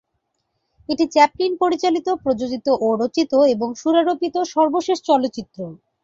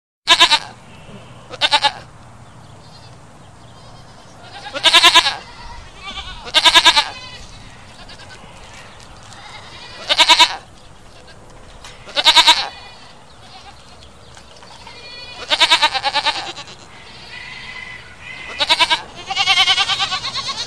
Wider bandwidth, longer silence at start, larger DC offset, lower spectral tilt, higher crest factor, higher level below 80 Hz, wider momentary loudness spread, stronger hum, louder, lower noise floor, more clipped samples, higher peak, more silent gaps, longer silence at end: second, 7.8 kHz vs over 20 kHz; first, 0.9 s vs 0.25 s; second, under 0.1% vs 0.5%; first, -4.5 dB/octave vs 0 dB/octave; about the same, 18 dB vs 20 dB; second, -60 dBFS vs -46 dBFS; second, 10 LU vs 27 LU; neither; second, -19 LUFS vs -12 LUFS; first, -73 dBFS vs -42 dBFS; neither; about the same, -2 dBFS vs 0 dBFS; neither; first, 0.3 s vs 0 s